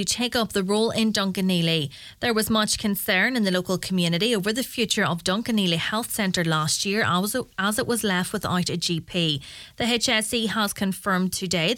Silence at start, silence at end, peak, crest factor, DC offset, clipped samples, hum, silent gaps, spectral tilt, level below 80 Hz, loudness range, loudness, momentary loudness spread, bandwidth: 0 s; 0 s; -6 dBFS; 18 dB; under 0.1%; under 0.1%; none; none; -3.5 dB/octave; -54 dBFS; 1 LU; -23 LUFS; 4 LU; 18 kHz